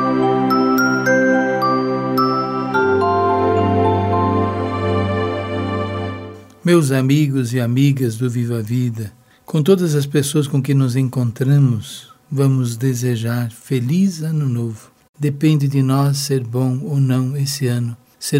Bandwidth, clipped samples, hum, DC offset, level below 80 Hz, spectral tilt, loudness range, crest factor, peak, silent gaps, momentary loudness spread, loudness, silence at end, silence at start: 16 kHz; under 0.1%; none; under 0.1%; -58 dBFS; -6.5 dB/octave; 3 LU; 16 dB; 0 dBFS; 15.09-15.14 s; 9 LU; -17 LUFS; 0 s; 0 s